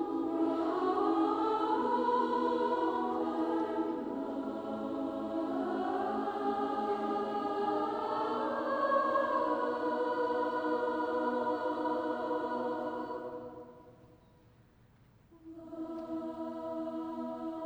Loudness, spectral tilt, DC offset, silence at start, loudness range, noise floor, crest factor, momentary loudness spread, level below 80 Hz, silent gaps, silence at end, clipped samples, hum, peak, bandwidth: -34 LUFS; -6.5 dB/octave; under 0.1%; 0 s; 12 LU; -63 dBFS; 18 dB; 10 LU; -70 dBFS; none; 0 s; under 0.1%; none; -16 dBFS; over 20 kHz